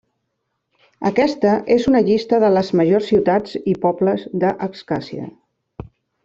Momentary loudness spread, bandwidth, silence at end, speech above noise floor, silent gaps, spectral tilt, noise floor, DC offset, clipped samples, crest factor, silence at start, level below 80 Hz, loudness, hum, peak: 16 LU; 7.6 kHz; 0.4 s; 57 dB; none; -7.5 dB/octave; -74 dBFS; under 0.1%; under 0.1%; 16 dB; 1 s; -52 dBFS; -18 LUFS; none; -2 dBFS